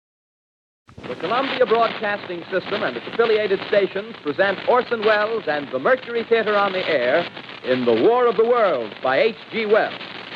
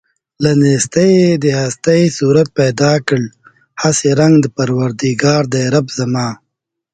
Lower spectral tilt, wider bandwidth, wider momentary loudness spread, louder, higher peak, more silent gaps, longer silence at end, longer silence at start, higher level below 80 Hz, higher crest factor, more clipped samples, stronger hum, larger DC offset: about the same, -6.5 dB/octave vs -5.5 dB/octave; second, 6.6 kHz vs 9.4 kHz; about the same, 9 LU vs 8 LU; second, -20 LUFS vs -13 LUFS; second, -4 dBFS vs 0 dBFS; neither; second, 0 s vs 0.6 s; first, 1 s vs 0.4 s; second, -68 dBFS vs -50 dBFS; about the same, 16 dB vs 14 dB; neither; neither; neither